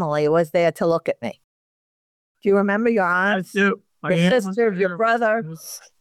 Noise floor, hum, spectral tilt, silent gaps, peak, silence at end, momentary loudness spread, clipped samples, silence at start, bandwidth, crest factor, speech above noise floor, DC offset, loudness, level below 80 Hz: under -90 dBFS; none; -6 dB/octave; 1.44-2.35 s; -8 dBFS; 0.2 s; 11 LU; under 0.1%; 0 s; 14.5 kHz; 12 dB; over 70 dB; under 0.1%; -20 LUFS; -68 dBFS